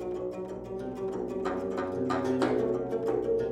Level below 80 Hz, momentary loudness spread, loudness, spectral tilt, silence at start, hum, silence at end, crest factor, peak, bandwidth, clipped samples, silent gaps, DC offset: -56 dBFS; 10 LU; -31 LUFS; -7 dB/octave; 0 s; none; 0 s; 18 dB; -14 dBFS; 11.5 kHz; under 0.1%; none; under 0.1%